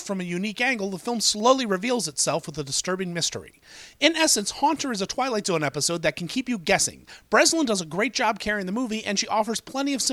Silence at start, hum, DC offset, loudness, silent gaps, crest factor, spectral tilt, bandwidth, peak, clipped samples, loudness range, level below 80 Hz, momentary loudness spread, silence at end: 0 s; none; under 0.1%; -24 LUFS; none; 22 dB; -2.5 dB/octave; 16 kHz; -2 dBFS; under 0.1%; 1 LU; -58 dBFS; 8 LU; 0 s